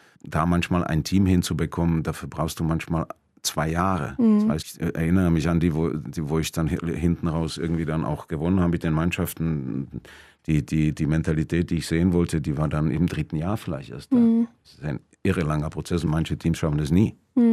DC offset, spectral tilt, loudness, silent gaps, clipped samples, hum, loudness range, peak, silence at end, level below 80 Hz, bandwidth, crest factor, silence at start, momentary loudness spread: under 0.1%; -6.5 dB/octave; -24 LUFS; none; under 0.1%; none; 2 LU; -6 dBFS; 0 s; -42 dBFS; 15 kHz; 16 dB; 0.25 s; 9 LU